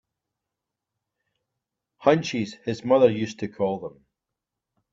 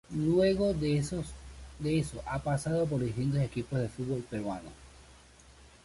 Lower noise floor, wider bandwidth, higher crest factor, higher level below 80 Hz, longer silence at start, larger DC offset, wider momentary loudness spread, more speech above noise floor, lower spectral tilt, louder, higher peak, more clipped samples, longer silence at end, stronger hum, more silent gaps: first, -86 dBFS vs -56 dBFS; second, 7.8 kHz vs 11.5 kHz; first, 24 dB vs 16 dB; second, -68 dBFS vs -50 dBFS; first, 2 s vs 0.1 s; neither; about the same, 12 LU vs 13 LU; first, 63 dB vs 26 dB; about the same, -6 dB/octave vs -7 dB/octave; first, -24 LUFS vs -32 LUFS; first, -4 dBFS vs -16 dBFS; neither; first, 1.05 s vs 0.2 s; neither; neither